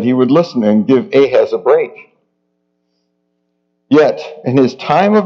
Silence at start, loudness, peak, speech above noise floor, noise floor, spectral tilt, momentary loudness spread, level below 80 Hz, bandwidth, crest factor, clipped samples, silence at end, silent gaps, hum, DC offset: 0 s; -12 LUFS; 0 dBFS; 55 dB; -66 dBFS; -7.5 dB/octave; 4 LU; -62 dBFS; 7 kHz; 14 dB; under 0.1%; 0 s; none; none; under 0.1%